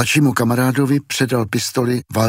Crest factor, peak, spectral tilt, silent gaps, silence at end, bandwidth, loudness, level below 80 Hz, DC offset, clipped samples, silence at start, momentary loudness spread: 16 dB; 0 dBFS; -5 dB/octave; none; 0 s; 16.5 kHz; -17 LUFS; -54 dBFS; under 0.1%; under 0.1%; 0 s; 5 LU